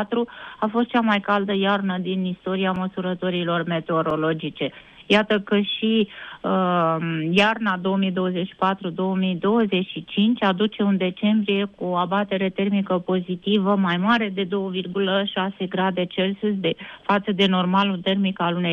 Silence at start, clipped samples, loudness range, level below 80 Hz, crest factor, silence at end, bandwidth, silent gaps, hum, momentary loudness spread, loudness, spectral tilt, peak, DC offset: 0 s; under 0.1%; 2 LU; -62 dBFS; 16 dB; 0 s; 6.8 kHz; none; none; 6 LU; -22 LUFS; -7.5 dB/octave; -6 dBFS; under 0.1%